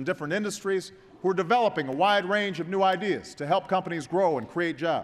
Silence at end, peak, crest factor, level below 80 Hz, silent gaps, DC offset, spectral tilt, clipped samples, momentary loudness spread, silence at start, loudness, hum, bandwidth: 0 s; -10 dBFS; 16 dB; -68 dBFS; none; under 0.1%; -5 dB/octave; under 0.1%; 7 LU; 0 s; -26 LUFS; none; 14 kHz